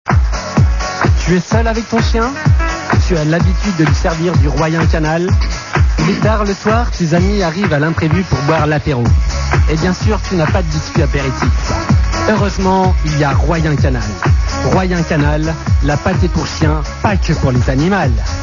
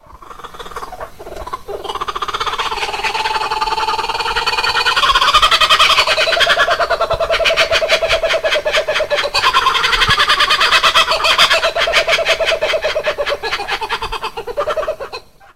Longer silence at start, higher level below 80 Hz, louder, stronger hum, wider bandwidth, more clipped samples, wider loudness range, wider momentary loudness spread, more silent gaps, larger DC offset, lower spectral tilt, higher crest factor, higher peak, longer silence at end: about the same, 0.05 s vs 0 s; first, -18 dBFS vs -36 dBFS; about the same, -14 LUFS vs -13 LUFS; neither; second, 7.4 kHz vs 16 kHz; neither; second, 1 LU vs 8 LU; second, 2 LU vs 17 LU; neither; second, 0.2% vs 1%; first, -6 dB/octave vs -1 dB/octave; about the same, 12 dB vs 16 dB; about the same, 0 dBFS vs 0 dBFS; about the same, 0 s vs 0 s